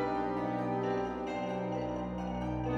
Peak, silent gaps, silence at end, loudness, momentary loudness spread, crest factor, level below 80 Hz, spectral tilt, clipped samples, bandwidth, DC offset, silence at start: -22 dBFS; none; 0 s; -35 LUFS; 4 LU; 12 dB; -50 dBFS; -7.5 dB/octave; under 0.1%; 8.2 kHz; under 0.1%; 0 s